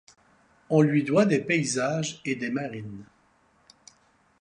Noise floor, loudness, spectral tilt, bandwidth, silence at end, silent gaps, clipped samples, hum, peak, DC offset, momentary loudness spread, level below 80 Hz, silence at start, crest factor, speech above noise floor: -64 dBFS; -25 LUFS; -5.5 dB/octave; 11 kHz; 1.35 s; none; under 0.1%; none; -8 dBFS; under 0.1%; 16 LU; -68 dBFS; 0.7 s; 20 dB; 39 dB